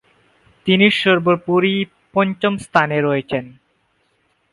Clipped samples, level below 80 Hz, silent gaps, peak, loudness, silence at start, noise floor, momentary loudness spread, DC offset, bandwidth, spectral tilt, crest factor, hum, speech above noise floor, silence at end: under 0.1%; -58 dBFS; none; 0 dBFS; -17 LUFS; 0.65 s; -64 dBFS; 10 LU; under 0.1%; 11.5 kHz; -6.5 dB/octave; 18 dB; 50 Hz at -50 dBFS; 47 dB; 1 s